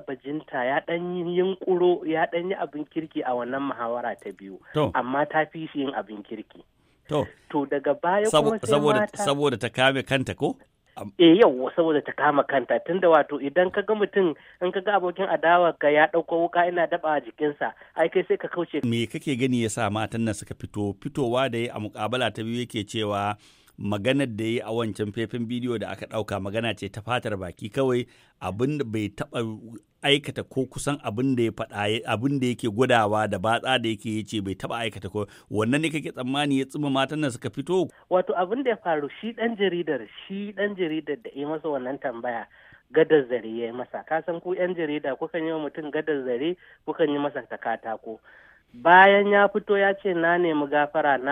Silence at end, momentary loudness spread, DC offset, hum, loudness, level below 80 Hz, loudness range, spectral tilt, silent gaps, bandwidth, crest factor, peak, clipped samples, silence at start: 0 s; 12 LU; under 0.1%; none; -25 LUFS; -62 dBFS; 7 LU; -5.5 dB/octave; none; 15.5 kHz; 22 dB; -2 dBFS; under 0.1%; 0.1 s